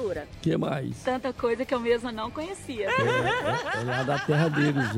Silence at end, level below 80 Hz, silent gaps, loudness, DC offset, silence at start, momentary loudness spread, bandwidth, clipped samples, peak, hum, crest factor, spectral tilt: 0 s; -54 dBFS; none; -27 LUFS; under 0.1%; 0 s; 9 LU; 15 kHz; under 0.1%; -10 dBFS; none; 16 dB; -6 dB/octave